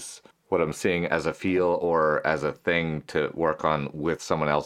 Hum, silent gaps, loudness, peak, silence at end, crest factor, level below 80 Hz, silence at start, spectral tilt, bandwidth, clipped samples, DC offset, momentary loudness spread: none; none; -26 LUFS; -6 dBFS; 0 s; 20 dB; -56 dBFS; 0 s; -5.5 dB/octave; 14.5 kHz; under 0.1%; under 0.1%; 6 LU